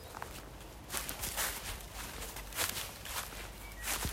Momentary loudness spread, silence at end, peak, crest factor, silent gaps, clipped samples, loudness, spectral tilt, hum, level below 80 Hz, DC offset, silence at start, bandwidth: 11 LU; 0 s; -14 dBFS; 28 dB; none; under 0.1%; -39 LUFS; -1.5 dB/octave; none; -50 dBFS; under 0.1%; 0 s; 16 kHz